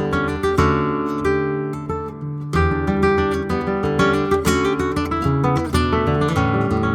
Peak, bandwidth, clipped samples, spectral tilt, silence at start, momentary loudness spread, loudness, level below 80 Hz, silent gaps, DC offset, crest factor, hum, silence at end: -2 dBFS; 18 kHz; under 0.1%; -6.5 dB/octave; 0 s; 6 LU; -19 LUFS; -32 dBFS; none; under 0.1%; 18 dB; none; 0 s